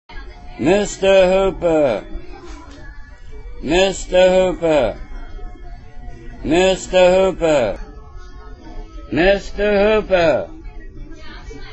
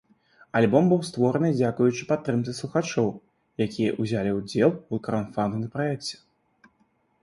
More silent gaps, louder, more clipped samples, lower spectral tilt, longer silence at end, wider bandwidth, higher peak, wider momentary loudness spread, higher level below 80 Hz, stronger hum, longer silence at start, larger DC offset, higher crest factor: neither; first, -16 LUFS vs -25 LUFS; neither; second, -5 dB/octave vs -6.5 dB/octave; second, 0 s vs 1.05 s; second, 8.2 kHz vs 11.5 kHz; first, 0 dBFS vs -6 dBFS; first, 24 LU vs 9 LU; first, -32 dBFS vs -60 dBFS; neither; second, 0.1 s vs 0.55 s; neither; about the same, 18 dB vs 20 dB